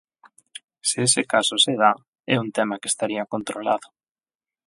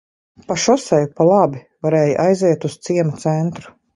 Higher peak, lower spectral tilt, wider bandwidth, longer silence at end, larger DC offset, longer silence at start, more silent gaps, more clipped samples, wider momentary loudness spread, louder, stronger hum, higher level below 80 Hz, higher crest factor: about the same, -2 dBFS vs -2 dBFS; second, -2.5 dB/octave vs -6 dB/octave; about the same, 11.5 kHz vs 11.5 kHz; first, 0.8 s vs 0.25 s; neither; first, 0.85 s vs 0.5 s; first, 2.08-2.13 s vs none; neither; first, 12 LU vs 9 LU; second, -22 LUFS vs -17 LUFS; neither; second, -70 dBFS vs -58 dBFS; first, 22 dB vs 16 dB